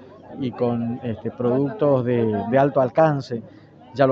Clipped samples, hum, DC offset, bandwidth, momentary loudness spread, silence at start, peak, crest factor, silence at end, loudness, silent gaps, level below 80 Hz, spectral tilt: under 0.1%; none; under 0.1%; 7.2 kHz; 13 LU; 0 s; -4 dBFS; 18 dB; 0 s; -21 LUFS; none; -60 dBFS; -9 dB/octave